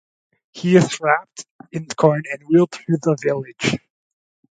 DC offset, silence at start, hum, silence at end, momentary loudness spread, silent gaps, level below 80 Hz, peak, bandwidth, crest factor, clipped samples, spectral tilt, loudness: under 0.1%; 0.55 s; none; 0.8 s; 15 LU; 1.51-1.59 s; -60 dBFS; 0 dBFS; 9.4 kHz; 20 dB; under 0.1%; -6 dB/octave; -19 LUFS